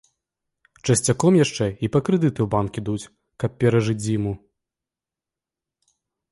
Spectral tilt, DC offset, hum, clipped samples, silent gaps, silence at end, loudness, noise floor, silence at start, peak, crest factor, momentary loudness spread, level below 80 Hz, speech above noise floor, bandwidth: -6 dB/octave; under 0.1%; none; under 0.1%; none; 1.95 s; -22 LUFS; -89 dBFS; 0.85 s; -6 dBFS; 18 dB; 12 LU; -50 dBFS; 68 dB; 11.5 kHz